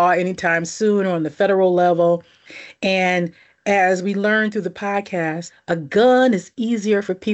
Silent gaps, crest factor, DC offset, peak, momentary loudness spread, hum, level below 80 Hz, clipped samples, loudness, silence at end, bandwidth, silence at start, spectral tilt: none; 12 dB; under 0.1%; -6 dBFS; 10 LU; none; -64 dBFS; under 0.1%; -19 LUFS; 0 s; 8.4 kHz; 0 s; -5.5 dB/octave